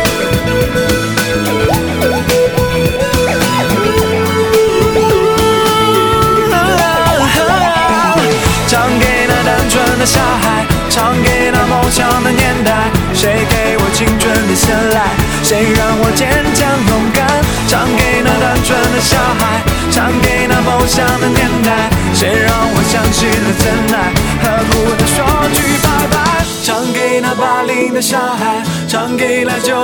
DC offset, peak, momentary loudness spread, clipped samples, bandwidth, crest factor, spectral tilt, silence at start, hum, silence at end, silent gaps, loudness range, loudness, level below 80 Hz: under 0.1%; 0 dBFS; 3 LU; under 0.1%; over 20 kHz; 10 dB; -4 dB/octave; 0 s; none; 0 s; none; 2 LU; -11 LUFS; -24 dBFS